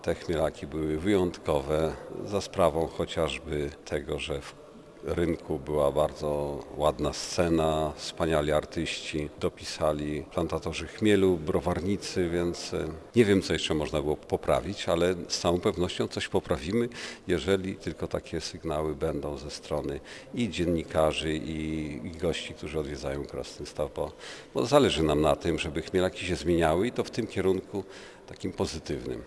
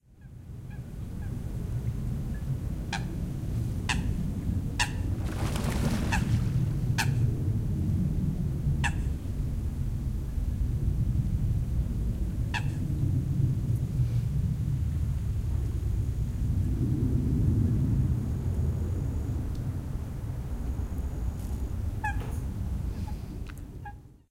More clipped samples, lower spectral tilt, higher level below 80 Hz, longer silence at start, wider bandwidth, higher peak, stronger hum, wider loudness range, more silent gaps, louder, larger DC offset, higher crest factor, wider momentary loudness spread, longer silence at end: neither; about the same, -5.5 dB/octave vs -6.5 dB/octave; second, -46 dBFS vs -34 dBFS; second, 0 s vs 0.2 s; second, 11 kHz vs 16 kHz; about the same, -8 dBFS vs -10 dBFS; neither; about the same, 4 LU vs 6 LU; neither; about the same, -29 LUFS vs -31 LUFS; neither; about the same, 22 dB vs 18 dB; about the same, 10 LU vs 9 LU; second, 0 s vs 0.2 s